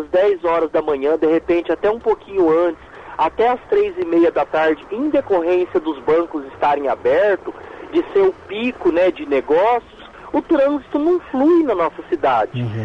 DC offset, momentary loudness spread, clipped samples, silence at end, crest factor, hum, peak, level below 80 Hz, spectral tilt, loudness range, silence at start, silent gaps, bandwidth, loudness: under 0.1%; 7 LU; under 0.1%; 0 s; 10 dB; none; -6 dBFS; -50 dBFS; -8 dB/octave; 1 LU; 0 s; none; 6.8 kHz; -18 LUFS